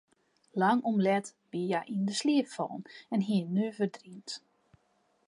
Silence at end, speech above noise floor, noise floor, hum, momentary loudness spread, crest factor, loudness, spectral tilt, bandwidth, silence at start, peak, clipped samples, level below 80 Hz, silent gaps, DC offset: 0.9 s; 42 dB; -72 dBFS; none; 15 LU; 16 dB; -31 LUFS; -5.5 dB/octave; 11.5 kHz; 0.55 s; -14 dBFS; under 0.1%; -82 dBFS; none; under 0.1%